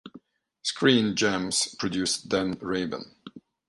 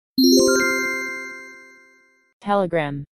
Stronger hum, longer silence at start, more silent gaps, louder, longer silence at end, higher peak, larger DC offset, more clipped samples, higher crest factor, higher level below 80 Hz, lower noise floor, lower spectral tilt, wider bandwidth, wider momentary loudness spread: neither; about the same, 0.05 s vs 0.15 s; second, none vs 2.33-2.40 s; second, -26 LUFS vs -19 LUFS; first, 0.3 s vs 0.1 s; second, -6 dBFS vs -2 dBFS; neither; neither; about the same, 22 dB vs 18 dB; about the same, -60 dBFS vs -58 dBFS; about the same, -53 dBFS vs -56 dBFS; about the same, -3.5 dB/octave vs -3.5 dB/octave; second, 11.5 kHz vs 14 kHz; second, 11 LU vs 20 LU